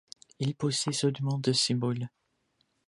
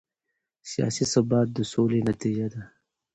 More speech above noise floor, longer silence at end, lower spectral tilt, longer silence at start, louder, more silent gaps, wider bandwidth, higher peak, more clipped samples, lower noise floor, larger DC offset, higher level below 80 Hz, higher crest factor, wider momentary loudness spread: second, 45 dB vs 58 dB; first, 0.8 s vs 0.5 s; second, -4.5 dB/octave vs -6 dB/octave; second, 0.4 s vs 0.65 s; second, -29 LUFS vs -26 LUFS; neither; first, 11.5 kHz vs 8.8 kHz; second, -14 dBFS vs -8 dBFS; neither; second, -74 dBFS vs -82 dBFS; neither; second, -72 dBFS vs -58 dBFS; about the same, 18 dB vs 18 dB; second, 9 LU vs 12 LU